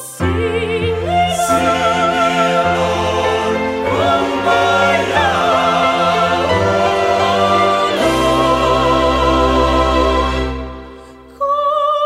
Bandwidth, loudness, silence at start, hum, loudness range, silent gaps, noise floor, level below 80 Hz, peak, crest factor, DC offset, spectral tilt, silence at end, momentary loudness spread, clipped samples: 16 kHz; -14 LUFS; 0 s; none; 2 LU; none; -37 dBFS; -30 dBFS; 0 dBFS; 14 dB; under 0.1%; -5 dB/octave; 0 s; 5 LU; under 0.1%